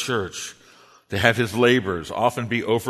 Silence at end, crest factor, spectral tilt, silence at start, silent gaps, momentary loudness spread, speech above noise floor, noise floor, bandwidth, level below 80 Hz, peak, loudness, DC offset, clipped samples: 0 s; 22 dB; -4.5 dB/octave; 0 s; none; 12 LU; 30 dB; -52 dBFS; 13.5 kHz; -54 dBFS; 0 dBFS; -21 LUFS; under 0.1%; under 0.1%